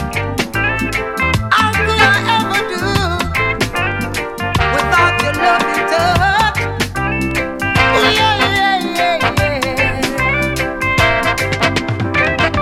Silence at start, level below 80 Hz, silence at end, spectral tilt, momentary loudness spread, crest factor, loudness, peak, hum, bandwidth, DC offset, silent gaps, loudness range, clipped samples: 0 s; -30 dBFS; 0 s; -4.5 dB/octave; 6 LU; 14 dB; -14 LUFS; 0 dBFS; none; 16.5 kHz; under 0.1%; none; 1 LU; under 0.1%